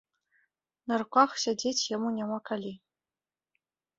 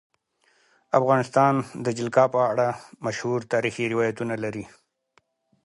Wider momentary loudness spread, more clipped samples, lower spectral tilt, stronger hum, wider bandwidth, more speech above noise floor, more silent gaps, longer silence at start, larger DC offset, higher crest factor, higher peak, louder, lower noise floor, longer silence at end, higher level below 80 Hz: about the same, 12 LU vs 11 LU; neither; second, -3 dB/octave vs -6 dB/octave; neither; second, 8 kHz vs 11.5 kHz; first, over 61 dB vs 43 dB; neither; about the same, 0.85 s vs 0.95 s; neither; about the same, 24 dB vs 20 dB; second, -10 dBFS vs -6 dBFS; second, -29 LUFS vs -24 LUFS; first, under -90 dBFS vs -66 dBFS; first, 1.2 s vs 1 s; second, -76 dBFS vs -66 dBFS